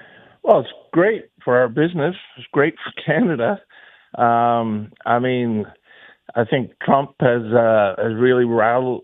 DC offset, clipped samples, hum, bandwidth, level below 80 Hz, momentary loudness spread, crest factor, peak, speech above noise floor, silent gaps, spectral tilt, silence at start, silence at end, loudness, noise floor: under 0.1%; under 0.1%; none; 4 kHz; -64 dBFS; 9 LU; 18 dB; 0 dBFS; 26 dB; none; -10 dB/octave; 0.45 s; 0.05 s; -19 LUFS; -44 dBFS